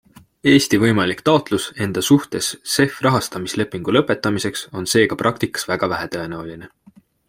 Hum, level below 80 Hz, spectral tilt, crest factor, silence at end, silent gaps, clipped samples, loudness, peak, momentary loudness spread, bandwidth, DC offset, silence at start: none; -54 dBFS; -4.5 dB/octave; 18 dB; 0.6 s; none; under 0.1%; -19 LUFS; -2 dBFS; 10 LU; 16.5 kHz; under 0.1%; 0.45 s